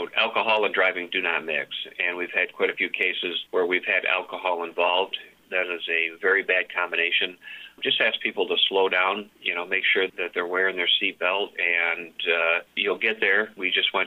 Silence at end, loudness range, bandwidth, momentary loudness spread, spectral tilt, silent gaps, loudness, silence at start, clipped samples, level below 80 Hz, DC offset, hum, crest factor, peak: 0 s; 2 LU; 15.5 kHz; 7 LU; -3.5 dB/octave; none; -23 LUFS; 0 s; under 0.1%; -76 dBFS; under 0.1%; none; 16 dB; -8 dBFS